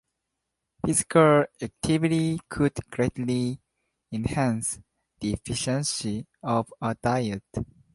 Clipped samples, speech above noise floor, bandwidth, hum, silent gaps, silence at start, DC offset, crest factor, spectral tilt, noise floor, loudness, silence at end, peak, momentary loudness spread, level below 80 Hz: under 0.1%; 57 dB; 12 kHz; none; none; 0.85 s; under 0.1%; 22 dB; -5 dB/octave; -82 dBFS; -26 LUFS; 0.3 s; -6 dBFS; 13 LU; -50 dBFS